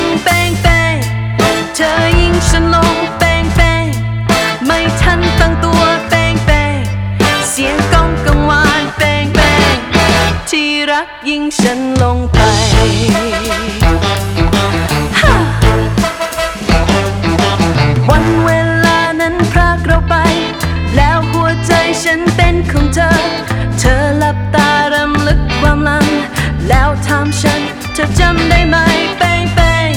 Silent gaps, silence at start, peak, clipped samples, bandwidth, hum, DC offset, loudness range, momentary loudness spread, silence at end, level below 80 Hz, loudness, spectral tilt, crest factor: none; 0 s; 0 dBFS; 0.2%; 19 kHz; none; under 0.1%; 1 LU; 5 LU; 0 s; -18 dBFS; -11 LUFS; -5 dB/octave; 10 dB